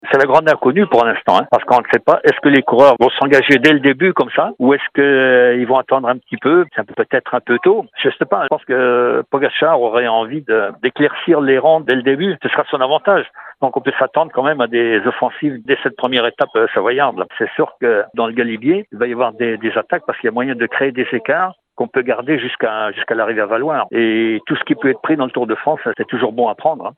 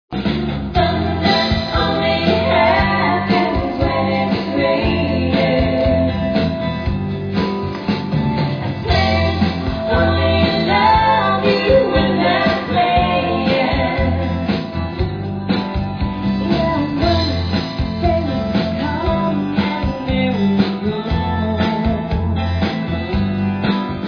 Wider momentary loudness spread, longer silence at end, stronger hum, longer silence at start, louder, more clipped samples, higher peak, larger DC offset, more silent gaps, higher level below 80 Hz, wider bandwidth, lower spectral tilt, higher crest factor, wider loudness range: about the same, 8 LU vs 7 LU; about the same, 0.05 s vs 0 s; neither; about the same, 0.05 s vs 0.1 s; about the same, -15 LUFS vs -17 LUFS; neither; about the same, 0 dBFS vs 0 dBFS; neither; neither; second, -62 dBFS vs -30 dBFS; first, 8.4 kHz vs 5.4 kHz; about the same, -6.5 dB/octave vs -7.5 dB/octave; about the same, 14 dB vs 16 dB; about the same, 6 LU vs 5 LU